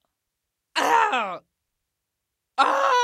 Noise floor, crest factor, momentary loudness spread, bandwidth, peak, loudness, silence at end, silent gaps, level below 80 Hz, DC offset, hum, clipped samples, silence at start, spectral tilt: -82 dBFS; 20 dB; 13 LU; 15 kHz; -4 dBFS; -22 LUFS; 0 s; none; -78 dBFS; under 0.1%; none; under 0.1%; 0.75 s; -1 dB/octave